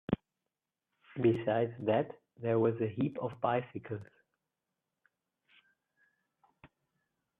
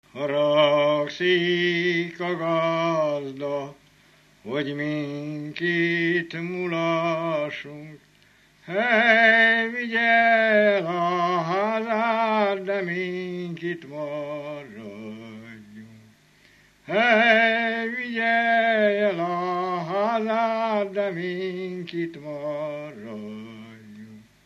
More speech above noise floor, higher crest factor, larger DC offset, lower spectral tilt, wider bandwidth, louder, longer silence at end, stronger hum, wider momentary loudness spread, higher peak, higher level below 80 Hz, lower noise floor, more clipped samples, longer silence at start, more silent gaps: first, 57 dB vs 34 dB; about the same, 22 dB vs 18 dB; neither; first, -10 dB/octave vs -6 dB/octave; second, 3.9 kHz vs 7.8 kHz; second, -34 LUFS vs -23 LUFS; first, 0.75 s vs 0.25 s; neither; second, 12 LU vs 19 LU; second, -14 dBFS vs -6 dBFS; first, -66 dBFS vs -72 dBFS; first, -90 dBFS vs -58 dBFS; neither; about the same, 0.1 s vs 0.15 s; neither